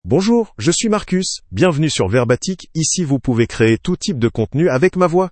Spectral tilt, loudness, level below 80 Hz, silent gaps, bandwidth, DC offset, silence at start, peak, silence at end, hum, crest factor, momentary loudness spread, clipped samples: -5 dB/octave; -16 LUFS; -42 dBFS; none; 8.8 kHz; under 0.1%; 0.05 s; 0 dBFS; 0 s; none; 16 dB; 5 LU; under 0.1%